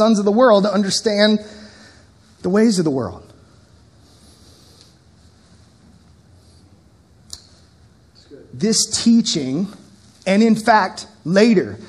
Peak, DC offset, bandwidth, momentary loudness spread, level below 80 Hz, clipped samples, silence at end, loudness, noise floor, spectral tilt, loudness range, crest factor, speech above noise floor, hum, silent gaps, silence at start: 0 dBFS; under 0.1%; 12.5 kHz; 18 LU; -56 dBFS; under 0.1%; 0.05 s; -16 LUFS; -51 dBFS; -4.5 dB/octave; 8 LU; 20 dB; 35 dB; none; none; 0 s